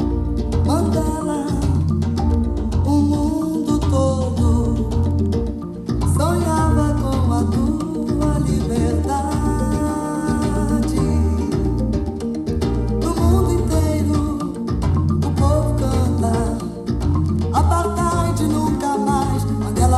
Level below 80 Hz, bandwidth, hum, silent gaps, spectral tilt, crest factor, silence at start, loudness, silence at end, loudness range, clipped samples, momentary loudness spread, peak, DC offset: -26 dBFS; 13.5 kHz; none; none; -7.5 dB/octave; 14 dB; 0 s; -19 LUFS; 0 s; 1 LU; under 0.1%; 5 LU; -4 dBFS; under 0.1%